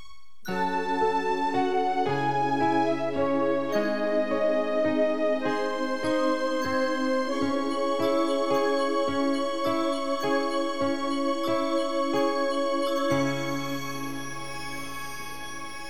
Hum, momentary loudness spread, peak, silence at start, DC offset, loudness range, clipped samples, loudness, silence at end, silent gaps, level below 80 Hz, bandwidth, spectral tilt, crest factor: none; 9 LU; -12 dBFS; 0.1 s; 2%; 2 LU; under 0.1%; -27 LUFS; 0 s; none; -62 dBFS; 18 kHz; -5 dB/octave; 14 dB